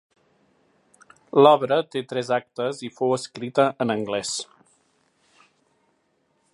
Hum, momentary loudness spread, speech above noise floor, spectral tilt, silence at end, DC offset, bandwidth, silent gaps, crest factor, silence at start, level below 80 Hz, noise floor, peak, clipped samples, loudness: none; 13 LU; 47 dB; -4.5 dB/octave; 2.1 s; under 0.1%; 11.5 kHz; none; 22 dB; 1.35 s; -72 dBFS; -69 dBFS; -2 dBFS; under 0.1%; -23 LUFS